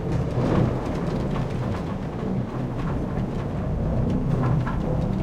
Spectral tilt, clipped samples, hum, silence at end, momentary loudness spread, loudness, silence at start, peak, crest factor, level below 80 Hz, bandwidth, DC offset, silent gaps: -9 dB/octave; under 0.1%; none; 0 s; 5 LU; -26 LUFS; 0 s; -8 dBFS; 16 dB; -34 dBFS; 9.4 kHz; under 0.1%; none